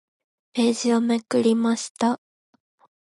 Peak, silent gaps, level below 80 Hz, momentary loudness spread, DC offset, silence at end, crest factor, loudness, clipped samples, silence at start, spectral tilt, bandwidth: -8 dBFS; 1.90-1.95 s; -74 dBFS; 5 LU; under 0.1%; 0.95 s; 16 dB; -23 LUFS; under 0.1%; 0.55 s; -4.5 dB/octave; 11.5 kHz